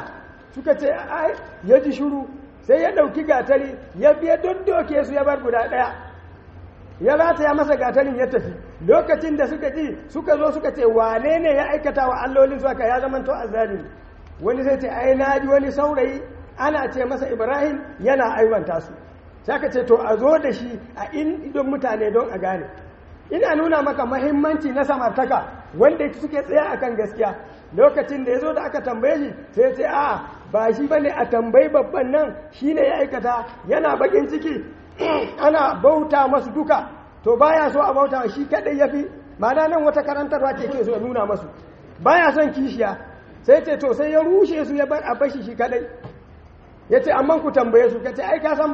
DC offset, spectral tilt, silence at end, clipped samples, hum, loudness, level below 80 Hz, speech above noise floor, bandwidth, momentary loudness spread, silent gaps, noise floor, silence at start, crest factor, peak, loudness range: under 0.1%; -4.5 dB/octave; 0 s; under 0.1%; none; -19 LUFS; -48 dBFS; 26 dB; 7 kHz; 10 LU; none; -45 dBFS; 0 s; 18 dB; 0 dBFS; 3 LU